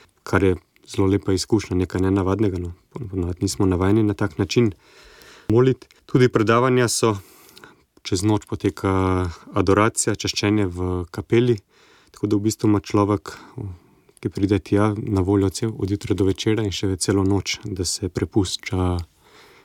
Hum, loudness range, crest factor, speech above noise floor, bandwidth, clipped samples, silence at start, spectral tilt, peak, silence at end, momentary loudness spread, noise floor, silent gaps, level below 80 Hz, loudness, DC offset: none; 3 LU; 18 dB; 30 dB; 16 kHz; under 0.1%; 0.25 s; -5.5 dB/octave; -4 dBFS; 0.6 s; 12 LU; -50 dBFS; none; -46 dBFS; -21 LUFS; under 0.1%